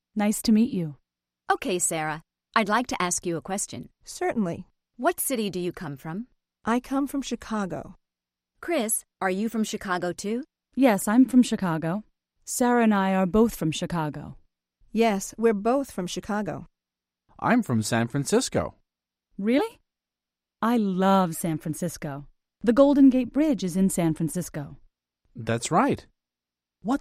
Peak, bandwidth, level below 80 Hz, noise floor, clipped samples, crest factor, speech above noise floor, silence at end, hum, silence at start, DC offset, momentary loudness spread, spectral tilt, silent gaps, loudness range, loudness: -6 dBFS; 15.5 kHz; -54 dBFS; -89 dBFS; under 0.1%; 20 dB; 65 dB; 0 s; none; 0.15 s; under 0.1%; 15 LU; -5 dB/octave; none; 6 LU; -25 LUFS